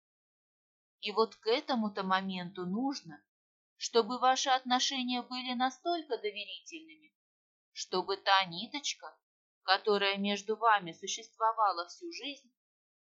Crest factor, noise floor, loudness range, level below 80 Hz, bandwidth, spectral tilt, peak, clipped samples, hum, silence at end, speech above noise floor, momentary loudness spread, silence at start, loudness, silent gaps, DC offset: 24 dB; under -90 dBFS; 4 LU; under -90 dBFS; 8 kHz; -1.5 dB/octave; -10 dBFS; under 0.1%; none; 0.8 s; over 57 dB; 14 LU; 1.05 s; -32 LUFS; 3.28-3.76 s, 7.15-7.72 s, 9.23-9.62 s; under 0.1%